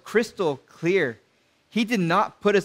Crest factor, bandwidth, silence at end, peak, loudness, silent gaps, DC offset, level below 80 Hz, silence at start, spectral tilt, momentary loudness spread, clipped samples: 18 dB; 16 kHz; 0 s; -8 dBFS; -24 LUFS; none; under 0.1%; -68 dBFS; 0.05 s; -5.5 dB/octave; 7 LU; under 0.1%